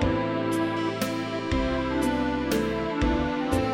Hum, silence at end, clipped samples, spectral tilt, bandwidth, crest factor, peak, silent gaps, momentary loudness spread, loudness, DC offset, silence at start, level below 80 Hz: none; 0 s; under 0.1%; -6 dB/octave; 16 kHz; 16 dB; -10 dBFS; none; 2 LU; -27 LUFS; under 0.1%; 0 s; -38 dBFS